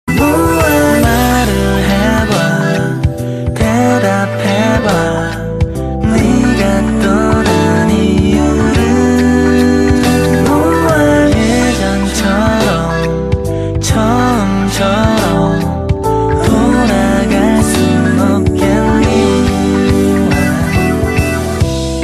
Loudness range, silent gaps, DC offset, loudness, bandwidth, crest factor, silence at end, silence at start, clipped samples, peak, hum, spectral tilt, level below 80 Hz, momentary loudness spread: 2 LU; none; under 0.1%; -11 LUFS; 14 kHz; 10 dB; 0 s; 0.05 s; under 0.1%; 0 dBFS; none; -6 dB/octave; -24 dBFS; 5 LU